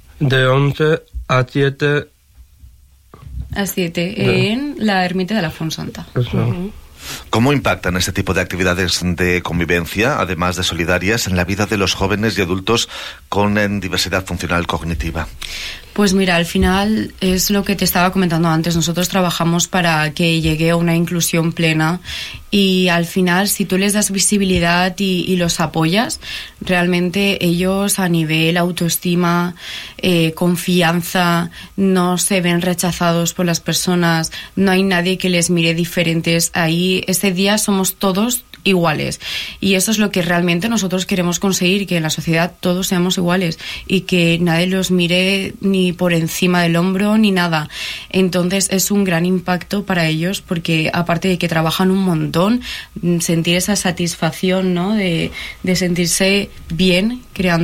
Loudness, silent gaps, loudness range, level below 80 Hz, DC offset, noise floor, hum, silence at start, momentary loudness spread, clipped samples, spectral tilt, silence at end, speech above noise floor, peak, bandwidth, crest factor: -16 LUFS; none; 3 LU; -38 dBFS; under 0.1%; -46 dBFS; none; 0.15 s; 7 LU; under 0.1%; -4.5 dB/octave; 0 s; 30 dB; -4 dBFS; 16.5 kHz; 12 dB